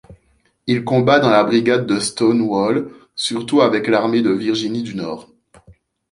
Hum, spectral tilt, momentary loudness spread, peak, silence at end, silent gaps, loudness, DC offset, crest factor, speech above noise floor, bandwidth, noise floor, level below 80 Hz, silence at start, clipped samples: none; -5 dB/octave; 12 LU; -2 dBFS; 0.4 s; none; -17 LUFS; under 0.1%; 16 dB; 44 dB; 11.5 kHz; -61 dBFS; -56 dBFS; 0.1 s; under 0.1%